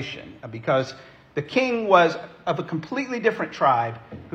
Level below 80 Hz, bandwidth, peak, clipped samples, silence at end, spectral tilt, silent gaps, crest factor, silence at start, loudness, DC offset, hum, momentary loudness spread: -64 dBFS; 8.4 kHz; -2 dBFS; under 0.1%; 0.05 s; -6 dB/octave; none; 22 dB; 0 s; -23 LUFS; under 0.1%; none; 17 LU